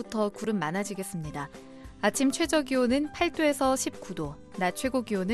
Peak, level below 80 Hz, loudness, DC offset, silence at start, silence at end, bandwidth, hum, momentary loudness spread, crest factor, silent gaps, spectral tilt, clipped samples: -12 dBFS; -54 dBFS; -29 LUFS; under 0.1%; 0 s; 0 s; 12.5 kHz; none; 12 LU; 18 dB; none; -4 dB/octave; under 0.1%